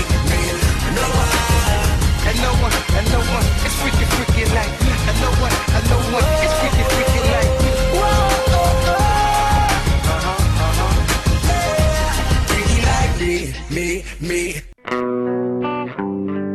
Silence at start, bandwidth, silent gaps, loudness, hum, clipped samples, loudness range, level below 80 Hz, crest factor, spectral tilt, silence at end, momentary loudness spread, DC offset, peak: 0 s; 13.5 kHz; none; -17 LUFS; none; under 0.1%; 4 LU; -20 dBFS; 12 dB; -4.5 dB/octave; 0 s; 7 LU; under 0.1%; -4 dBFS